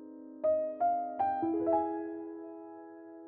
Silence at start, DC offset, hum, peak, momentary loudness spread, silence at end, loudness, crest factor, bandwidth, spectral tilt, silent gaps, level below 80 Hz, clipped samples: 0 s; under 0.1%; none; -18 dBFS; 18 LU; 0 s; -33 LUFS; 16 dB; 3.4 kHz; -7.5 dB/octave; none; -76 dBFS; under 0.1%